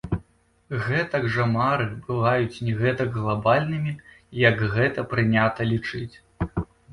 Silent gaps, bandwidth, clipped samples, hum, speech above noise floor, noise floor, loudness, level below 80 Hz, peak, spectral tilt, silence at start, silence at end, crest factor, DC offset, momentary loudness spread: none; 10.5 kHz; under 0.1%; none; 36 dB; -59 dBFS; -24 LUFS; -46 dBFS; -4 dBFS; -8 dB/octave; 0.05 s; 0 s; 20 dB; under 0.1%; 12 LU